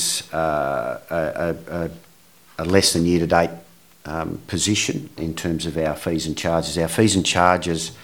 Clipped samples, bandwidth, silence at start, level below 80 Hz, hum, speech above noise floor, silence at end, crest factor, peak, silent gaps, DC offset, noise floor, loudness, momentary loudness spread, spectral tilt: under 0.1%; 19.5 kHz; 0 s; -44 dBFS; none; 31 dB; 0 s; 22 dB; 0 dBFS; none; 0.2%; -52 dBFS; -21 LUFS; 12 LU; -4 dB/octave